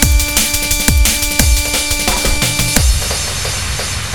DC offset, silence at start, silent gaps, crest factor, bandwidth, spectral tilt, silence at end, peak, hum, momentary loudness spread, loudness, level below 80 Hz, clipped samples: 2%; 0 s; none; 14 dB; over 20 kHz; -2.5 dB/octave; 0 s; 0 dBFS; none; 6 LU; -13 LUFS; -18 dBFS; 0.2%